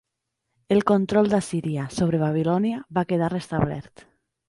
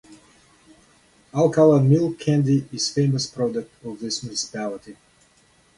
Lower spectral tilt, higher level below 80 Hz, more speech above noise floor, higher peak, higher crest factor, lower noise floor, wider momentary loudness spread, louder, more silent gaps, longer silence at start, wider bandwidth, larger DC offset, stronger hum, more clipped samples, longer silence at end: about the same, -7 dB/octave vs -6 dB/octave; first, -52 dBFS vs -60 dBFS; first, 58 dB vs 38 dB; about the same, -6 dBFS vs -4 dBFS; about the same, 18 dB vs 18 dB; first, -80 dBFS vs -58 dBFS; second, 7 LU vs 16 LU; about the same, -23 LUFS vs -21 LUFS; neither; first, 0.7 s vs 0.1 s; about the same, 11.5 kHz vs 11.5 kHz; neither; neither; neither; second, 0.65 s vs 0.85 s